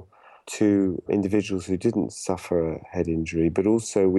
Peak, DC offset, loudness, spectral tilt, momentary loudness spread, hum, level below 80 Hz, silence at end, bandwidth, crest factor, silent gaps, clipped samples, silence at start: -8 dBFS; under 0.1%; -24 LUFS; -6.5 dB/octave; 7 LU; none; -54 dBFS; 0 s; 12 kHz; 16 dB; none; under 0.1%; 0 s